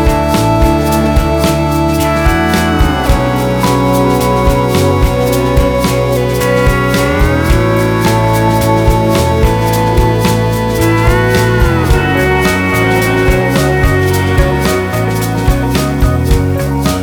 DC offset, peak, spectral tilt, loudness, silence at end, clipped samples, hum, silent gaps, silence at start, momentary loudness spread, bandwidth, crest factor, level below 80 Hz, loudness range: under 0.1%; 0 dBFS; -6 dB/octave; -11 LUFS; 0 s; under 0.1%; none; none; 0 s; 2 LU; 19.5 kHz; 10 dB; -18 dBFS; 1 LU